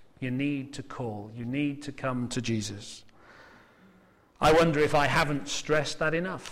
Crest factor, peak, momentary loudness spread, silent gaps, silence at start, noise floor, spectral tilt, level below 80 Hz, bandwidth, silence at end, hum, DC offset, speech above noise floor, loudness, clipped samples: 16 dB; -12 dBFS; 15 LU; none; 0 s; -60 dBFS; -5 dB/octave; -50 dBFS; 16 kHz; 0 s; none; under 0.1%; 32 dB; -28 LUFS; under 0.1%